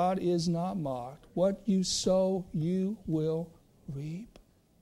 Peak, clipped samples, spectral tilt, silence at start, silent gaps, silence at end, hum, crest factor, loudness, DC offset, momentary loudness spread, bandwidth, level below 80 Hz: -16 dBFS; under 0.1%; -6 dB/octave; 0 s; none; 0.55 s; none; 14 dB; -31 LUFS; under 0.1%; 14 LU; 12.5 kHz; -58 dBFS